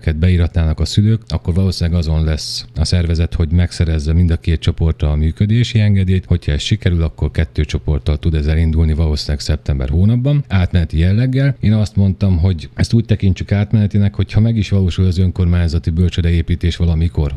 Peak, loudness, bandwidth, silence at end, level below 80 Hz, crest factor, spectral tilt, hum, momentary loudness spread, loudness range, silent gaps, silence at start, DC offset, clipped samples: 0 dBFS; -16 LUFS; 11 kHz; 0 s; -22 dBFS; 14 dB; -7 dB/octave; none; 4 LU; 2 LU; none; 0.05 s; under 0.1%; under 0.1%